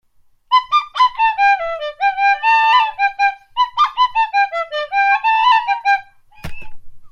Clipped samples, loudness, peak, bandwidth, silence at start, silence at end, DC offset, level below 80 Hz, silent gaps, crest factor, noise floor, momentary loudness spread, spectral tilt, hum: under 0.1%; -15 LUFS; -2 dBFS; 9.6 kHz; 0.5 s; 0.05 s; under 0.1%; -46 dBFS; none; 14 dB; -43 dBFS; 7 LU; -1.5 dB/octave; none